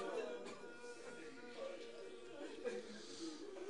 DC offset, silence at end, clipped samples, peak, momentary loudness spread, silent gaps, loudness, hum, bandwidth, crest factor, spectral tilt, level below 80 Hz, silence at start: 0.1%; 0 s; under 0.1%; -32 dBFS; 7 LU; none; -51 LUFS; none; 10.5 kHz; 18 dB; -3 dB/octave; -86 dBFS; 0 s